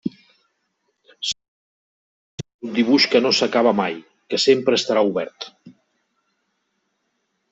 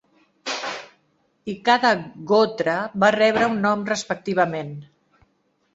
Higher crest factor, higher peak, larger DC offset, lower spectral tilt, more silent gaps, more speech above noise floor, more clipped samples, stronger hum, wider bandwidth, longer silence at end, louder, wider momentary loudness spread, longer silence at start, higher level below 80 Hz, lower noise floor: about the same, 20 dB vs 20 dB; about the same, -4 dBFS vs -2 dBFS; neither; about the same, -3.5 dB/octave vs -4.5 dB/octave; first, 1.48-2.38 s, 2.54-2.59 s vs none; first, 54 dB vs 47 dB; neither; neither; about the same, 8.2 kHz vs 8 kHz; first, 1.8 s vs 0.9 s; about the same, -19 LUFS vs -21 LUFS; first, 21 LU vs 17 LU; second, 0.05 s vs 0.45 s; about the same, -66 dBFS vs -64 dBFS; first, -72 dBFS vs -67 dBFS